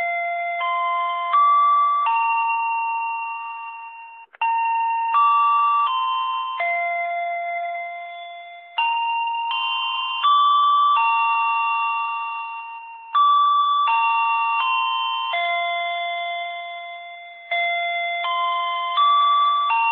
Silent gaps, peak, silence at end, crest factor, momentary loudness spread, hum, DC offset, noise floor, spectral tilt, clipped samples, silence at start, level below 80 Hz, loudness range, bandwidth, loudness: none; -8 dBFS; 0 s; 12 dB; 16 LU; none; under 0.1%; -41 dBFS; 1.5 dB/octave; under 0.1%; 0 s; under -90 dBFS; 5 LU; 4.8 kHz; -20 LUFS